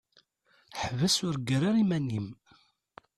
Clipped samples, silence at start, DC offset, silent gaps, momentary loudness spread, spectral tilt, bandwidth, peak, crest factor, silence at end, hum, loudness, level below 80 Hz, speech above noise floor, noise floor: under 0.1%; 0.7 s; under 0.1%; none; 12 LU; -5 dB/octave; 14 kHz; -14 dBFS; 16 dB; 0.85 s; none; -29 LUFS; -62 dBFS; 39 dB; -68 dBFS